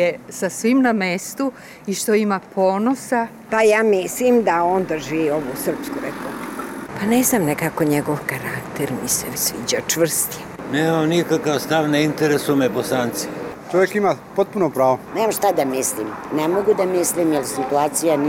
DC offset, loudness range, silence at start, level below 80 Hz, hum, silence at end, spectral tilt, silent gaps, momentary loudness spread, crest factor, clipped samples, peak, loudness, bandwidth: under 0.1%; 3 LU; 0 s; -54 dBFS; none; 0 s; -4 dB/octave; none; 10 LU; 14 dB; under 0.1%; -6 dBFS; -20 LUFS; 16.5 kHz